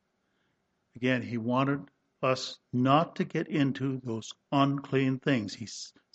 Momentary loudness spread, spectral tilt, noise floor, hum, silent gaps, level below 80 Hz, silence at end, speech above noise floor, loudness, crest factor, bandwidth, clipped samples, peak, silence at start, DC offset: 12 LU; -6 dB/octave; -76 dBFS; none; none; -70 dBFS; 0.25 s; 47 dB; -30 LUFS; 20 dB; 8.2 kHz; under 0.1%; -10 dBFS; 0.95 s; under 0.1%